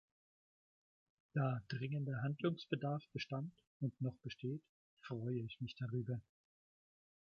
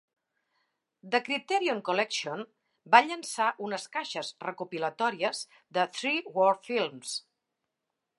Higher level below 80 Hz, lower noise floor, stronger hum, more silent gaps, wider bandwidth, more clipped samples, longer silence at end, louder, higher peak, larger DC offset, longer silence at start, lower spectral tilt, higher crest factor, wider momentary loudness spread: first, -76 dBFS vs -88 dBFS; first, under -90 dBFS vs -85 dBFS; neither; first, 3.67-3.80 s, 4.69-4.97 s vs none; second, 6.8 kHz vs 11.5 kHz; neither; first, 1.15 s vs 1 s; second, -44 LUFS vs -29 LUFS; second, -24 dBFS vs -4 dBFS; neither; first, 1.35 s vs 1.05 s; first, -8 dB/octave vs -2.5 dB/octave; about the same, 22 dB vs 26 dB; second, 8 LU vs 14 LU